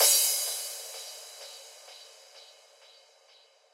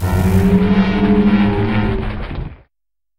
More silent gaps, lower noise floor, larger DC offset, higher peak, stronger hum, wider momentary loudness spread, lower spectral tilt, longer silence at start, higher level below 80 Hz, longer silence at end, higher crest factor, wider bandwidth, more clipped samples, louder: neither; second, -61 dBFS vs -85 dBFS; neither; second, -10 dBFS vs -2 dBFS; neither; first, 27 LU vs 14 LU; second, 8 dB/octave vs -8 dB/octave; about the same, 0 s vs 0 s; second, under -90 dBFS vs -26 dBFS; first, 1.3 s vs 0.65 s; first, 22 dB vs 14 dB; about the same, 16 kHz vs 16 kHz; neither; second, -27 LUFS vs -15 LUFS